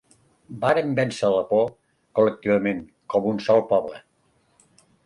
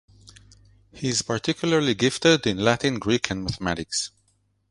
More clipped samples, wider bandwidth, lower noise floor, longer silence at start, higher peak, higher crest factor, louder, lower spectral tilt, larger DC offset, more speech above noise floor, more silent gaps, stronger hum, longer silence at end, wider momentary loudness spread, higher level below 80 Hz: neither; about the same, 11.5 kHz vs 11.5 kHz; about the same, -65 dBFS vs -67 dBFS; first, 0.5 s vs 0.25 s; second, -6 dBFS vs -2 dBFS; second, 16 dB vs 22 dB; about the same, -23 LUFS vs -23 LUFS; first, -6.5 dB/octave vs -4 dB/octave; neither; about the same, 43 dB vs 44 dB; neither; neither; first, 1.05 s vs 0.6 s; about the same, 8 LU vs 8 LU; second, -62 dBFS vs -50 dBFS